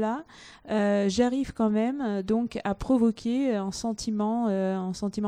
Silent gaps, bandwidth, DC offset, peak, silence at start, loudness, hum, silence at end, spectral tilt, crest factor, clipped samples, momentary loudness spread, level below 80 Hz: none; 10.5 kHz; under 0.1%; -10 dBFS; 0 s; -27 LUFS; none; 0 s; -6 dB/octave; 16 dB; under 0.1%; 7 LU; -52 dBFS